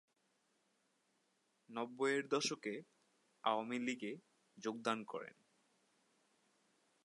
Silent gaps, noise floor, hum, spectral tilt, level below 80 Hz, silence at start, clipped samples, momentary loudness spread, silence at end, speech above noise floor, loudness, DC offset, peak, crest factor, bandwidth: none; -81 dBFS; none; -3.5 dB/octave; under -90 dBFS; 1.7 s; under 0.1%; 13 LU; 1.75 s; 40 dB; -42 LUFS; under 0.1%; -20 dBFS; 24 dB; 11.5 kHz